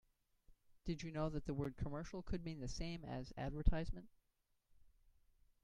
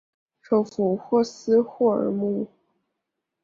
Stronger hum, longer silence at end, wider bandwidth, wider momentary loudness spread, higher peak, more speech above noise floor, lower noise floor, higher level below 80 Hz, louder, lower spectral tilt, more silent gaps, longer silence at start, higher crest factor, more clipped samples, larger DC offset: neither; second, 0.75 s vs 0.95 s; first, 9.6 kHz vs 7.6 kHz; about the same, 7 LU vs 6 LU; second, -20 dBFS vs -10 dBFS; second, 42 dB vs 60 dB; about the same, -83 dBFS vs -82 dBFS; first, -48 dBFS vs -70 dBFS; second, -46 LUFS vs -23 LUFS; about the same, -6.5 dB/octave vs -7.5 dB/octave; neither; about the same, 0.5 s vs 0.5 s; first, 24 dB vs 16 dB; neither; neither